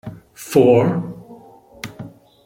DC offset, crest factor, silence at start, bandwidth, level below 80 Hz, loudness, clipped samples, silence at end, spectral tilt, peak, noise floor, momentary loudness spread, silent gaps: under 0.1%; 18 dB; 0.05 s; 16.5 kHz; -56 dBFS; -16 LUFS; under 0.1%; 0.35 s; -7 dB/octave; -2 dBFS; -44 dBFS; 25 LU; none